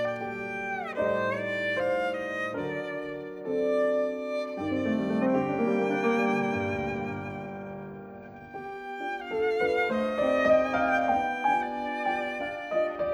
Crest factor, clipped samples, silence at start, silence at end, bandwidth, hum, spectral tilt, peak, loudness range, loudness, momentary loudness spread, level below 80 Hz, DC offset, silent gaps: 16 dB; under 0.1%; 0 s; 0 s; 11.5 kHz; none; -6.5 dB/octave; -12 dBFS; 5 LU; -28 LUFS; 12 LU; -60 dBFS; under 0.1%; none